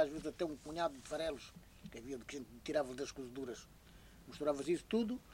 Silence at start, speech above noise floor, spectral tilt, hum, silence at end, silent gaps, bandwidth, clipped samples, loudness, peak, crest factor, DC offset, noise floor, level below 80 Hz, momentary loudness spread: 0 s; 19 dB; -5 dB/octave; none; 0 s; none; 16 kHz; under 0.1%; -41 LUFS; -22 dBFS; 20 dB; under 0.1%; -60 dBFS; -64 dBFS; 18 LU